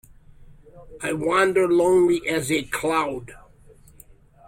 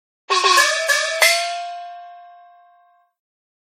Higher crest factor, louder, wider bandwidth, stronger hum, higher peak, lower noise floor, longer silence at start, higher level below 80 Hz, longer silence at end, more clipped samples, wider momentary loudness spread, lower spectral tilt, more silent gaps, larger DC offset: about the same, 16 dB vs 20 dB; second, -21 LUFS vs -16 LUFS; about the same, 16.5 kHz vs 16 kHz; neither; second, -8 dBFS vs 0 dBFS; second, -50 dBFS vs -56 dBFS; about the same, 0.4 s vs 0.3 s; first, -52 dBFS vs under -90 dBFS; second, 1.15 s vs 1.4 s; neither; second, 11 LU vs 21 LU; first, -4.5 dB/octave vs 5 dB/octave; neither; neither